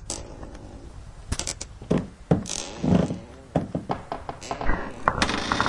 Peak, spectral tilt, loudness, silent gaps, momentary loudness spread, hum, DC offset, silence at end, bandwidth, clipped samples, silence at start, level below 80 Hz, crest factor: -2 dBFS; -4.5 dB/octave; -28 LUFS; none; 18 LU; none; under 0.1%; 0 s; 11.5 kHz; under 0.1%; 0 s; -38 dBFS; 26 dB